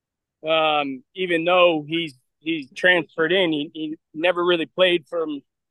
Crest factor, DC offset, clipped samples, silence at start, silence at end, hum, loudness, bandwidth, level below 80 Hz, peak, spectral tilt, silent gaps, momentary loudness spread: 18 dB; under 0.1%; under 0.1%; 0.45 s; 0.3 s; none; -21 LUFS; 10 kHz; -78 dBFS; -4 dBFS; -5.5 dB/octave; none; 14 LU